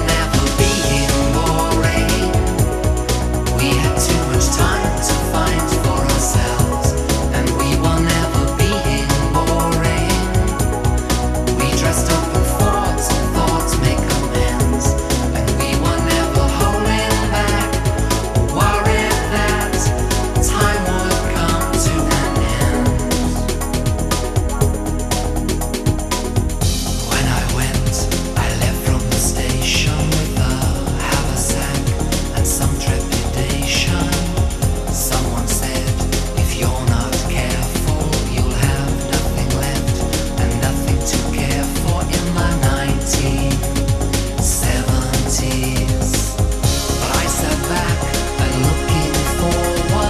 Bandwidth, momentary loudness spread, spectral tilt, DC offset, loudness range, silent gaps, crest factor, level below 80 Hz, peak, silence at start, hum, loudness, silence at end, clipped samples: 14 kHz; 3 LU; -4.5 dB/octave; 0.1%; 2 LU; none; 16 dB; -22 dBFS; 0 dBFS; 0 s; none; -17 LUFS; 0 s; under 0.1%